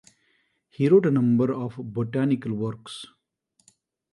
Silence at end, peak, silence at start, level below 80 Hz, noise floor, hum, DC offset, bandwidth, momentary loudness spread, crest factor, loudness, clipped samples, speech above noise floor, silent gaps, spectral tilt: 1.1 s; -8 dBFS; 0.8 s; -66 dBFS; -70 dBFS; none; under 0.1%; 11.5 kHz; 19 LU; 18 dB; -23 LUFS; under 0.1%; 47 dB; none; -8.5 dB/octave